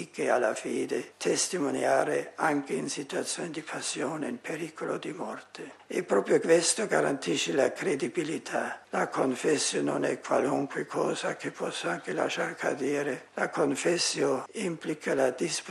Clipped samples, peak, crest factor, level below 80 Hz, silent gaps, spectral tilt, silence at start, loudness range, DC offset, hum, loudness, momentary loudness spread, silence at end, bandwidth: under 0.1%; -10 dBFS; 20 dB; -78 dBFS; none; -3.5 dB/octave; 0 s; 5 LU; under 0.1%; none; -29 LUFS; 8 LU; 0 s; 13 kHz